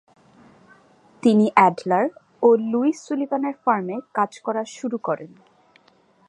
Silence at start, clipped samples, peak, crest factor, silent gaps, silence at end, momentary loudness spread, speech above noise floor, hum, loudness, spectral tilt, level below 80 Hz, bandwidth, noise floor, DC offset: 1.25 s; under 0.1%; -2 dBFS; 20 dB; none; 1 s; 11 LU; 38 dB; none; -21 LUFS; -6.5 dB/octave; -76 dBFS; 10 kHz; -58 dBFS; under 0.1%